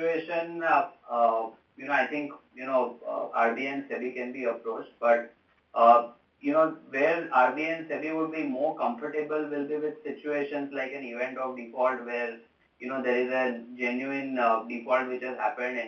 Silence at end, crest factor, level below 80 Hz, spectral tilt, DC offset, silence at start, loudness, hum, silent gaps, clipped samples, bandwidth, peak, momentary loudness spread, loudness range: 0 s; 22 dB; -80 dBFS; -6 dB/octave; under 0.1%; 0 s; -28 LUFS; none; none; under 0.1%; 6.6 kHz; -6 dBFS; 11 LU; 6 LU